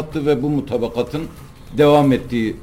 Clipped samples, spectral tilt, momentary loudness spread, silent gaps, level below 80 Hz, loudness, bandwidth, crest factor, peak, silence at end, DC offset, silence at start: under 0.1%; -7.5 dB/octave; 15 LU; none; -40 dBFS; -18 LUFS; 16.5 kHz; 14 dB; -4 dBFS; 0 s; under 0.1%; 0 s